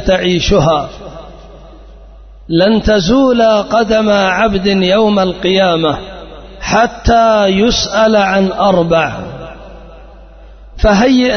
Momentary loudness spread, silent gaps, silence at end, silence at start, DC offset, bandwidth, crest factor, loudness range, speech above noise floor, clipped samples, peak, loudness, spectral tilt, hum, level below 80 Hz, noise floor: 16 LU; none; 0 s; 0 s; under 0.1%; 6.6 kHz; 12 dB; 3 LU; 25 dB; under 0.1%; 0 dBFS; -11 LUFS; -5 dB/octave; none; -28 dBFS; -35 dBFS